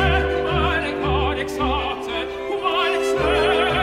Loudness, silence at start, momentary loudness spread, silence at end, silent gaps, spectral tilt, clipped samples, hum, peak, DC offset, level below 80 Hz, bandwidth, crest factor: -21 LUFS; 0 s; 7 LU; 0 s; none; -5.5 dB/octave; under 0.1%; none; -6 dBFS; under 0.1%; -30 dBFS; 15 kHz; 14 dB